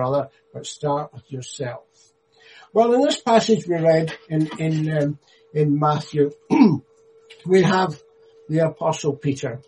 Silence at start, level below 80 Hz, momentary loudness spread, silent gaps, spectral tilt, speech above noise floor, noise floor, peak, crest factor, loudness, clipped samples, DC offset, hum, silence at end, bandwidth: 0 s; -62 dBFS; 17 LU; none; -6.5 dB/octave; 30 dB; -50 dBFS; -2 dBFS; 18 dB; -21 LUFS; under 0.1%; under 0.1%; none; 0.05 s; 10.5 kHz